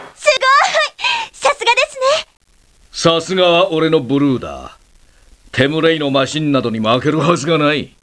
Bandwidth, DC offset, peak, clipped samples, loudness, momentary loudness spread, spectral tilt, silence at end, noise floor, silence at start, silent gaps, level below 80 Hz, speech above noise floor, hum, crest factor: 11 kHz; under 0.1%; 0 dBFS; under 0.1%; -14 LUFS; 6 LU; -4.5 dB/octave; 0.15 s; -48 dBFS; 0 s; none; -48 dBFS; 34 dB; none; 16 dB